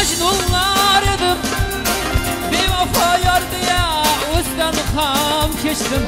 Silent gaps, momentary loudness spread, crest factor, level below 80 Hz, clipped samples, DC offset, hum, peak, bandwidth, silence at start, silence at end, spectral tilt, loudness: none; 5 LU; 16 dB; -28 dBFS; under 0.1%; under 0.1%; none; 0 dBFS; 16.5 kHz; 0 s; 0 s; -3 dB/octave; -16 LUFS